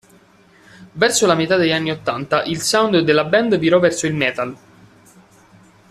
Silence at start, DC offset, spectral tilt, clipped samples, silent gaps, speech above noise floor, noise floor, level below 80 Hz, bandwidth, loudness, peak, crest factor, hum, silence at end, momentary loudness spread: 0.8 s; under 0.1%; -4 dB/octave; under 0.1%; none; 34 dB; -50 dBFS; -56 dBFS; 14 kHz; -17 LUFS; -2 dBFS; 16 dB; none; 1.35 s; 8 LU